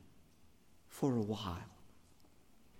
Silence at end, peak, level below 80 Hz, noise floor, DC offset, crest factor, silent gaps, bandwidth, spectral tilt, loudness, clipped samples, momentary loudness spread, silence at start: 0 s; -22 dBFS; -70 dBFS; -68 dBFS; under 0.1%; 20 dB; none; 17 kHz; -6.5 dB/octave; -39 LUFS; under 0.1%; 20 LU; 0 s